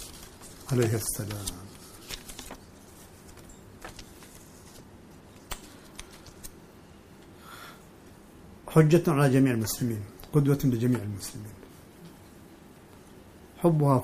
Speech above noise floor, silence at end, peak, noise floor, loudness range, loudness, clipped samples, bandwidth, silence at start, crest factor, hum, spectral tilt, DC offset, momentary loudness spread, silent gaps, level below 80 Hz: 27 dB; 0 s; -8 dBFS; -51 dBFS; 21 LU; -26 LUFS; under 0.1%; 15.5 kHz; 0 s; 22 dB; none; -6.5 dB/octave; under 0.1%; 27 LU; none; -52 dBFS